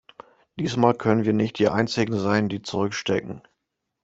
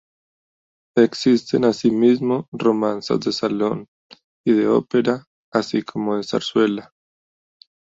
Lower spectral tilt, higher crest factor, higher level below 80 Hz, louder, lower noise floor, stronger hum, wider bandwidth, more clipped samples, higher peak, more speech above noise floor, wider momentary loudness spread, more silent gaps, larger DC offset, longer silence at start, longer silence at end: about the same, -6 dB/octave vs -6 dB/octave; about the same, 20 dB vs 18 dB; about the same, -58 dBFS vs -62 dBFS; second, -23 LUFS vs -20 LUFS; second, -80 dBFS vs under -90 dBFS; neither; about the same, 8 kHz vs 7.8 kHz; neither; about the same, -4 dBFS vs -2 dBFS; second, 57 dB vs over 71 dB; about the same, 9 LU vs 7 LU; second, none vs 2.48-2.52 s, 3.88-4.10 s, 4.24-4.44 s, 5.27-5.52 s; neither; second, 0.55 s vs 0.95 s; second, 0.65 s vs 1.05 s